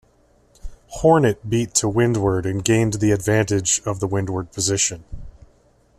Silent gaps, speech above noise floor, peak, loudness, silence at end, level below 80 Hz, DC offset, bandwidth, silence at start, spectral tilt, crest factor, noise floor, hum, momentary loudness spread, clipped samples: none; 38 dB; -2 dBFS; -19 LUFS; 0.7 s; -42 dBFS; under 0.1%; 13.5 kHz; 0.65 s; -4.5 dB/octave; 18 dB; -57 dBFS; none; 7 LU; under 0.1%